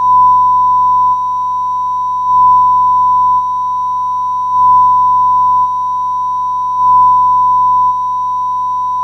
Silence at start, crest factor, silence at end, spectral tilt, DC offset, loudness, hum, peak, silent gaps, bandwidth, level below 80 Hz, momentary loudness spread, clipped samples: 0 s; 8 dB; 0 s; -5 dB/octave; under 0.1%; -10 LUFS; none; -2 dBFS; none; 6.2 kHz; -42 dBFS; 8 LU; under 0.1%